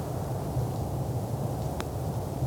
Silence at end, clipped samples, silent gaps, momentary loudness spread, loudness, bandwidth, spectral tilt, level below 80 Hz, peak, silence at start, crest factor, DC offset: 0 s; under 0.1%; none; 2 LU; -32 LUFS; 19.5 kHz; -7 dB/octave; -42 dBFS; -14 dBFS; 0 s; 16 dB; under 0.1%